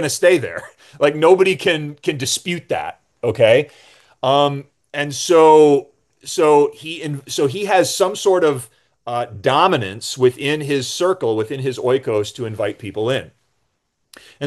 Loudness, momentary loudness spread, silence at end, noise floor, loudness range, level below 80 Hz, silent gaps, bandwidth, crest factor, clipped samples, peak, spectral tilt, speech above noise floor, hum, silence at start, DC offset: -17 LUFS; 13 LU; 0 s; -70 dBFS; 5 LU; -62 dBFS; none; 12.5 kHz; 18 dB; under 0.1%; 0 dBFS; -4.5 dB/octave; 54 dB; none; 0 s; under 0.1%